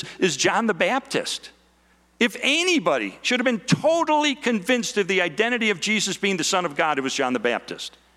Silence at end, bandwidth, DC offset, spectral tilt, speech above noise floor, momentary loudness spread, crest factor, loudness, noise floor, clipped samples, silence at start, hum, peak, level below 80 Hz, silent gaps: 0.3 s; 15 kHz; under 0.1%; -3 dB/octave; 37 dB; 6 LU; 16 dB; -22 LUFS; -60 dBFS; under 0.1%; 0 s; none; -6 dBFS; -64 dBFS; none